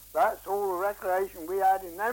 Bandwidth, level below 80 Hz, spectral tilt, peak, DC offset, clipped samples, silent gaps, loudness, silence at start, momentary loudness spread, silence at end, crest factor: 17 kHz; -60 dBFS; -4 dB/octave; -14 dBFS; under 0.1%; under 0.1%; none; -28 LUFS; 0 s; 5 LU; 0 s; 14 dB